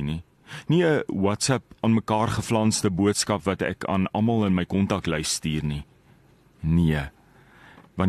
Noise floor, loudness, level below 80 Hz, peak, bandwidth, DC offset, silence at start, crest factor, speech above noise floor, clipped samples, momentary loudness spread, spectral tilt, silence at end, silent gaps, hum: -56 dBFS; -24 LUFS; -44 dBFS; -8 dBFS; 13 kHz; under 0.1%; 0 s; 18 dB; 33 dB; under 0.1%; 10 LU; -5 dB/octave; 0 s; none; none